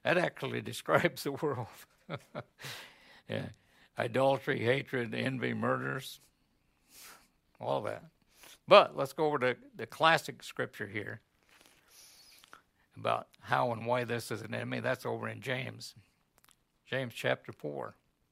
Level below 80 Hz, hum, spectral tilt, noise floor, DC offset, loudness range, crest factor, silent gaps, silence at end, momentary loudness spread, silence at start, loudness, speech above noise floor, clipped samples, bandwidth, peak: -76 dBFS; none; -5 dB/octave; -73 dBFS; under 0.1%; 9 LU; 28 dB; none; 0.4 s; 18 LU; 0.05 s; -33 LUFS; 41 dB; under 0.1%; 16 kHz; -6 dBFS